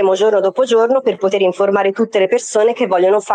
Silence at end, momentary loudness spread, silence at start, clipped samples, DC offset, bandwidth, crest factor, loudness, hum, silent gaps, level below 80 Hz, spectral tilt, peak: 0 s; 3 LU; 0 s; under 0.1%; under 0.1%; 9.8 kHz; 10 dB; -14 LUFS; none; none; -66 dBFS; -4.5 dB/octave; -4 dBFS